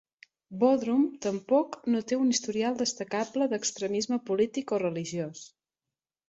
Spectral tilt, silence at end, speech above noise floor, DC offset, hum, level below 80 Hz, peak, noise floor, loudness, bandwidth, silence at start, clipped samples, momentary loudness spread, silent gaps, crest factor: -4 dB/octave; 0.8 s; over 62 dB; under 0.1%; none; -74 dBFS; -12 dBFS; under -90 dBFS; -29 LUFS; 8.2 kHz; 0.5 s; under 0.1%; 8 LU; none; 18 dB